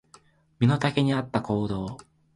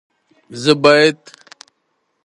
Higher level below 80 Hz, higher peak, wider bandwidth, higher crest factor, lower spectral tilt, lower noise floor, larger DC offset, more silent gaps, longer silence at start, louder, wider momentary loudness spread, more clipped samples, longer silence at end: first, -54 dBFS vs -62 dBFS; second, -8 dBFS vs 0 dBFS; about the same, 11 kHz vs 11.5 kHz; about the same, 18 dB vs 18 dB; first, -7 dB/octave vs -4.5 dB/octave; second, -58 dBFS vs -68 dBFS; neither; neither; about the same, 0.6 s vs 0.5 s; second, -26 LUFS vs -13 LUFS; second, 12 LU vs 24 LU; neither; second, 0.4 s vs 1.1 s